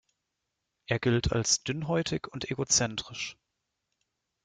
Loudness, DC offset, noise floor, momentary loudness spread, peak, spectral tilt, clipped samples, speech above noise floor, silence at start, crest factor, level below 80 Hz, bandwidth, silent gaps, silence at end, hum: -29 LUFS; under 0.1%; -84 dBFS; 11 LU; -12 dBFS; -3.5 dB/octave; under 0.1%; 54 dB; 0.9 s; 20 dB; -50 dBFS; 10.5 kHz; none; 1.1 s; none